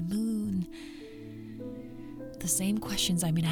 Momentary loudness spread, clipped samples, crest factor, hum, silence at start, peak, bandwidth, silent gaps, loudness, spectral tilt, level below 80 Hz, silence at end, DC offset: 17 LU; under 0.1%; 16 dB; none; 0 s; -16 dBFS; 19 kHz; none; -31 LUFS; -4 dB/octave; -52 dBFS; 0 s; under 0.1%